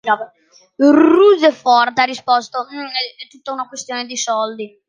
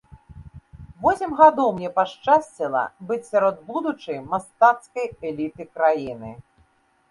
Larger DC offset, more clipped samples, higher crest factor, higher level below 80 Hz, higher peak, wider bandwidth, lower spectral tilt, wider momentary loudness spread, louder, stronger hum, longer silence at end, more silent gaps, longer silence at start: neither; neither; second, 14 dB vs 22 dB; second, -66 dBFS vs -54 dBFS; about the same, -2 dBFS vs 0 dBFS; second, 9.8 kHz vs 11.5 kHz; second, -2.5 dB/octave vs -6 dB/octave; about the same, 16 LU vs 14 LU; first, -15 LUFS vs -22 LUFS; neither; second, 0.2 s vs 0.7 s; neither; second, 0.05 s vs 0.3 s